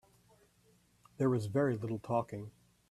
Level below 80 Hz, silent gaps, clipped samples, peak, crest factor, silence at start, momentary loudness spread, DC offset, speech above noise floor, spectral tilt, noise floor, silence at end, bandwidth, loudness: -70 dBFS; none; under 0.1%; -18 dBFS; 18 dB; 1.2 s; 14 LU; under 0.1%; 35 dB; -8.5 dB/octave; -69 dBFS; 0.4 s; 13.5 kHz; -35 LUFS